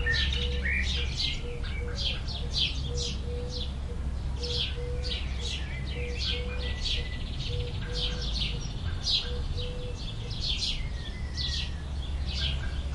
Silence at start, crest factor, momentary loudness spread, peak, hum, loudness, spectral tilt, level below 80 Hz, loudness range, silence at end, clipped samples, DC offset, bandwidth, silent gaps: 0 s; 18 dB; 8 LU; -14 dBFS; none; -31 LUFS; -4 dB/octave; -34 dBFS; 2 LU; 0 s; under 0.1%; under 0.1%; 11 kHz; none